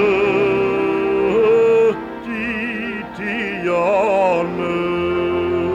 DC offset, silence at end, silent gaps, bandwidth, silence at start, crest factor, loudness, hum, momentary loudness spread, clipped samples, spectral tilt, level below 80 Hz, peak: under 0.1%; 0 s; none; 9.2 kHz; 0 s; 12 dB; -18 LUFS; none; 10 LU; under 0.1%; -6.5 dB/octave; -48 dBFS; -6 dBFS